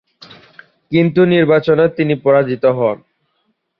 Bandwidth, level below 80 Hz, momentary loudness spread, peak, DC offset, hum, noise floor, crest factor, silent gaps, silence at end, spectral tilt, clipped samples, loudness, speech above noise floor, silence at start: 5.8 kHz; -56 dBFS; 7 LU; 0 dBFS; under 0.1%; none; -66 dBFS; 14 dB; none; 0.85 s; -9.5 dB/octave; under 0.1%; -14 LUFS; 53 dB; 0.9 s